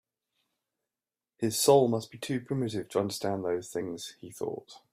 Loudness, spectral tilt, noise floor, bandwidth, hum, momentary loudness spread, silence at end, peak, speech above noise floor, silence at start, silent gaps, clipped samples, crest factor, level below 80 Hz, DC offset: -30 LUFS; -4.5 dB/octave; under -90 dBFS; 16 kHz; none; 16 LU; 0.15 s; -10 dBFS; over 60 dB; 1.4 s; none; under 0.1%; 22 dB; -72 dBFS; under 0.1%